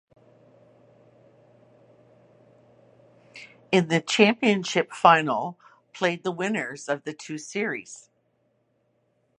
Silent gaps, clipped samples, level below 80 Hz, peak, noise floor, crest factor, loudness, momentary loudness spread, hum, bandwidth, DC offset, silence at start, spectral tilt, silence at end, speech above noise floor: none; under 0.1%; -76 dBFS; -2 dBFS; -70 dBFS; 26 dB; -24 LUFS; 21 LU; none; 10.5 kHz; under 0.1%; 3.35 s; -4.5 dB/octave; 1.4 s; 46 dB